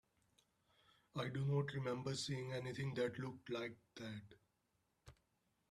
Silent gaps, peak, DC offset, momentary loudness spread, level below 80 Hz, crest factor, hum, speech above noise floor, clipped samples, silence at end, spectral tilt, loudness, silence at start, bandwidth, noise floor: none; -28 dBFS; under 0.1%; 12 LU; -76 dBFS; 18 dB; none; 40 dB; under 0.1%; 0.6 s; -5.5 dB/octave; -44 LUFS; 1.15 s; 12 kHz; -84 dBFS